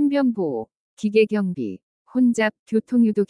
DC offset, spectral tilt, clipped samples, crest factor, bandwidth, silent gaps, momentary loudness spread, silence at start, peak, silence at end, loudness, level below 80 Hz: under 0.1%; -6.5 dB/octave; under 0.1%; 14 dB; 10.5 kHz; 0.77-0.97 s, 1.83-2.05 s, 2.59-2.66 s; 12 LU; 0 s; -6 dBFS; 0.05 s; -22 LUFS; -70 dBFS